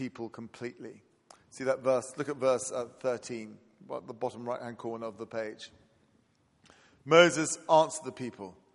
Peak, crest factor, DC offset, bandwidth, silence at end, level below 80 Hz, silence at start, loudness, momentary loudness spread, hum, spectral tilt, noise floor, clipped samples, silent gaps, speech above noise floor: -6 dBFS; 26 dB; under 0.1%; 11.5 kHz; 0.2 s; -78 dBFS; 0 s; -30 LUFS; 19 LU; none; -3.5 dB/octave; -69 dBFS; under 0.1%; none; 38 dB